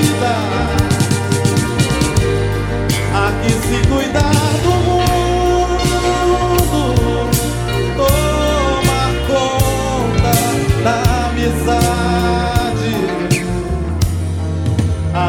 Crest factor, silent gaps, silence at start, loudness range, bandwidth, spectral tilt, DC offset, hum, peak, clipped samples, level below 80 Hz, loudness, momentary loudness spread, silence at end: 14 dB; none; 0 s; 2 LU; 17.5 kHz; -5.5 dB/octave; under 0.1%; none; 0 dBFS; under 0.1%; -24 dBFS; -15 LUFS; 4 LU; 0 s